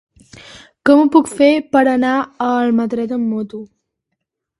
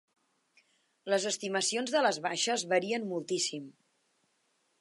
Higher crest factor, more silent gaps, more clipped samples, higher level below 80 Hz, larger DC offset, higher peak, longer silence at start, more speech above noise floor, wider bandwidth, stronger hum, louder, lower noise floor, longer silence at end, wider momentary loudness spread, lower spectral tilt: about the same, 16 dB vs 20 dB; neither; neither; first, -58 dBFS vs -88 dBFS; neither; first, 0 dBFS vs -14 dBFS; second, 0.55 s vs 1.05 s; first, 62 dB vs 44 dB; about the same, 11.5 kHz vs 11.5 kHz; neither; first, -15 LUFS vs -31 LUFS; about the same, -76 dBFS vs -75 dBFS; second, 0.95 s vs 1.1 s; first, 10 LU vs 6 LU; first, -5.5 dB/octave vs -2 dB/octave